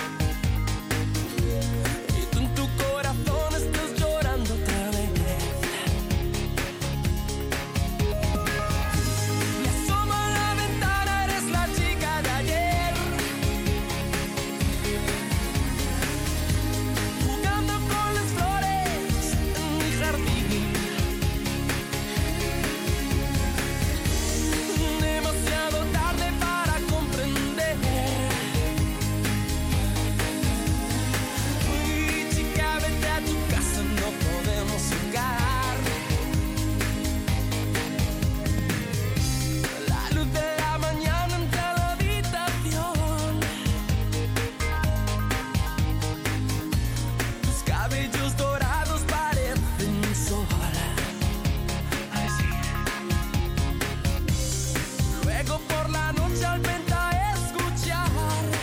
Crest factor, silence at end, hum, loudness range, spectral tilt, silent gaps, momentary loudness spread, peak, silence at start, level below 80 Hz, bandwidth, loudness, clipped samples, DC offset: 12 dB; 0 s; none; 2 LU; -4.5 dB/octave; none; 3 LU; -12 dBFS; 0 s; -32 dBFS; 17 kHz; -26 LUFS; under 0.1%; under 0.1%